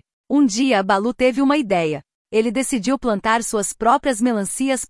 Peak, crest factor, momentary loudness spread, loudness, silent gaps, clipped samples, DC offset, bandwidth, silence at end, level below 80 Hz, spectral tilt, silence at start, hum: -4 dBFS; 14 dB; 5 LU; -19 LUFS; 2.15-2.25 s; under 0.1%; under 0.1%; 12 kHz; 0.05 s; -50 dBFS; -4 dB/octave; 0.3 s; none